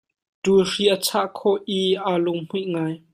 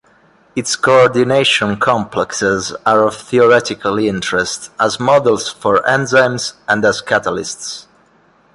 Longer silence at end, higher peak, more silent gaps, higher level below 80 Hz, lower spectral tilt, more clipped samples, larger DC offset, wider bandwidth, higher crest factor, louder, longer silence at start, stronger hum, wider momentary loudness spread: second, 0.15 s vs 0.75 s; second, -6 dBFS vs 0 dBFS; neither; second, -62 dBFS vs -50 dBFS; about the same, -4.5 dB/octave vs -3.5 dB/octave; neither; neither; first, 15.5 kHz vs 11.5 kHz; about the same, 16 dB vs 14 dB; second, -22 LUFS vs -14 LUFS; about the same, 0.45 s vs 0.55 s; neither; about the same, 8 LU vs 10 LU